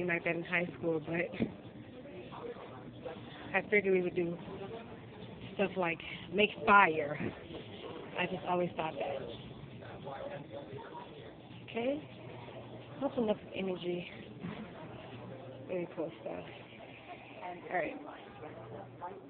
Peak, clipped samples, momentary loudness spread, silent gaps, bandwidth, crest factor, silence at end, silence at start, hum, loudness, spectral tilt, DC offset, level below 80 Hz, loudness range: -10 dBFS; under 0.1%; 18 LU; none; 4.5 kHz; 28 dB; 0 s; 0 s; none; -35 LUFS; -3.5 dB/octave; under 0.1%; -66 dBFS; 11 LU